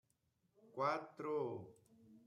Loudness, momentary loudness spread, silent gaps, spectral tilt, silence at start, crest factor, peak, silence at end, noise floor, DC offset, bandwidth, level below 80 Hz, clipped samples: -43 LUFS; 15 LU; none; -6.5 dB/octave; 0.65 s; 20 dB; -26 dBFS; 0.1 s; -82 dBFS; under 0.1%; 11 kHz; under -90 dBFS; under 0.1%